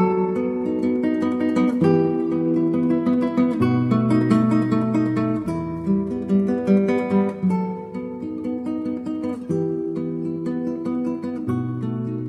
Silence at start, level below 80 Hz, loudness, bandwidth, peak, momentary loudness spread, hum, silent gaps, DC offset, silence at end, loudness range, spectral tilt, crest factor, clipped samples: 0 s; -56 dBFS; -22 LUFS; 10.5 kHz; -4 dBFS; 9 LU; none; none; under 0.1%; 0 s; 6 LU; -9 dB/octave; 16 dB; under 0.1%